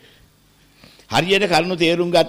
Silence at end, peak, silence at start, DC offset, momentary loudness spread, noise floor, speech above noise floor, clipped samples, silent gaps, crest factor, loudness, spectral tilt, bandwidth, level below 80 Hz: 0 s; -4 dBFS; 1.1 s; under 0.1%; 5 LU; -54 dBFS; 38 dB; under 0.1%; none; 14 dB; -17 LUFS; -4.5 dB/octave; 16 kHz; -52 dBFS